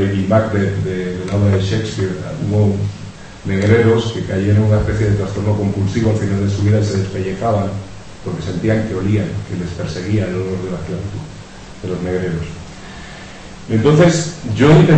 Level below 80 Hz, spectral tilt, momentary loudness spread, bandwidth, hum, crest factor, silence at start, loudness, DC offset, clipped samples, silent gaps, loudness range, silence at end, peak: -36 dBFS; -7 dB/octave; 19 LU; 8.6 kHz; none; 16 dB; 0 s; -17 LUFS; under 0.1%; under 0.1%; none; 7 LU; 0 s; 0 dBFS